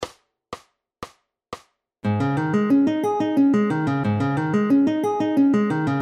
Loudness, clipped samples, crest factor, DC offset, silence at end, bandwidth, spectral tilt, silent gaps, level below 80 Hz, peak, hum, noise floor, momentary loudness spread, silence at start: -21 LUFS; under 0.1%; 12 dB; under 0.1%; 0 s; 9.8 kHz; -8 dB/octave; none; -60 dBFS; -10 dBFS; none; -49 dBFS; 21 LU; 0 s